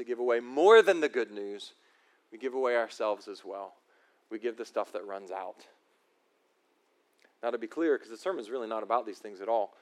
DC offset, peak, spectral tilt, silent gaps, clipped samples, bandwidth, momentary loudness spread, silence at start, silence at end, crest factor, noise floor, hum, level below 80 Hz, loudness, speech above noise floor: under 0.1%; -8 dBFS; -3.5 dB/octave; none; under 0.1%; 11.5 kHz; 19 LU; 0 s; 0.15 s; 24 dB; -72 dBFS; none; under -90 dBFS; -30 LUFS; 42 dB